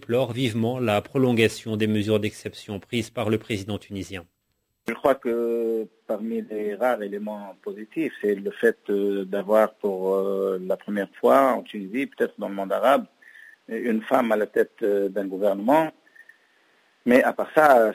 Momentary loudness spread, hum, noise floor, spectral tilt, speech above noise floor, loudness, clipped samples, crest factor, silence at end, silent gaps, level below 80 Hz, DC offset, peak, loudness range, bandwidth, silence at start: 13 LU; none; -74 dBFS; -6 dB/octave; 51 dB; -24 LUFS; under 0.1%; 18 dB; 0 s; none; -60 dBFS; under 0.1%; -4 dBFS; 5 LU; 16 kHz; 0.1 s